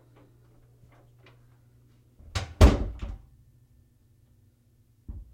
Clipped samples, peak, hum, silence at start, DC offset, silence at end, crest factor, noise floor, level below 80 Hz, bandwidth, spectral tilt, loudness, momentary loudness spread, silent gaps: under 0.1%; -4 dBFS; none; 2.35 s; under 0.1%; 0.1 s; 26 dB; -63 dBFS; -32 dBFS; 16 kHz; -6.5 dB/octave; -25 LUFS; 26 LU; none